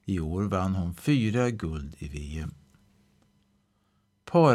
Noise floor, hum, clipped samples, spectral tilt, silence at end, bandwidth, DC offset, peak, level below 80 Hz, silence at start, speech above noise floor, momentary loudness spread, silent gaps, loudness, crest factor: -70 dBFS; none; under 0.1%; -7.5 dB/octave; 0 s; 14 kHz; under 0.1%; -8 dBFS; -46 dBFS; 0.05 s; 42 dB; 14 LU; none; -29 LUFS; 20 dB